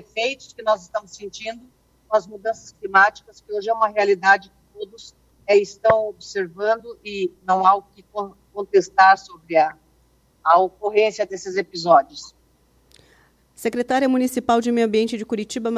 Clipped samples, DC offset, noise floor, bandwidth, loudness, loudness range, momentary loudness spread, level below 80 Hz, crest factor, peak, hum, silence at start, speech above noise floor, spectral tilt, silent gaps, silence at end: under 0.1%; under 0.1%; -59 dBFS; 14.5 kHz; -20 LUFS; 4 LU; 16 LU; -60 dBFS; 18 dB; -2 dBFS; none; 0.15 s; 39 dB; -4 dB/octave; none; 0 s